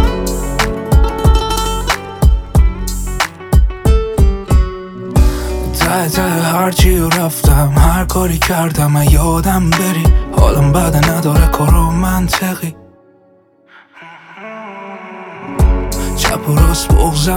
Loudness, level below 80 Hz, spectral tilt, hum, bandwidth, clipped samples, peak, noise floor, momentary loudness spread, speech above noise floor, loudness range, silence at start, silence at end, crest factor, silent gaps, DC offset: -13 LUFS; -16 dBFS; -5.5 dB/octave; none; 17.5 kHz; under 0.1%; 0 dBFS; -49 dBFS; 10 LU; 38 dB; 8 LU; 0 s; 0 s; 12 dB; none; under 0.1%